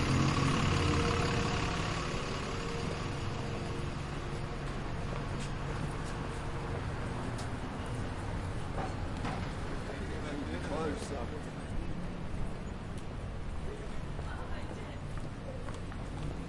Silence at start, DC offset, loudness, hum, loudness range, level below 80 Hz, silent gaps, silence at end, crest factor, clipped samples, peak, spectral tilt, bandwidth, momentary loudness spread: 0 s; under 0.1%; -37 LUFS; none; 8 LU; -42 dBFS; none; 0 s; 18 dB; under 0.1%; -16 dBFS; -5.5 dB/octave; 11.5 kHz; 12 LU